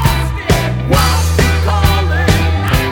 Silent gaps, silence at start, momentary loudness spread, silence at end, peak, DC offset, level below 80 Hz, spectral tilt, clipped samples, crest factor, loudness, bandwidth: none; 0 s; 2 LU; 0 s; 0 dBFS; under 0.1%; -18 dBFS; -5 dB/octave; under 0.1%; 12 dB; -13 LUFS; over 20 kHz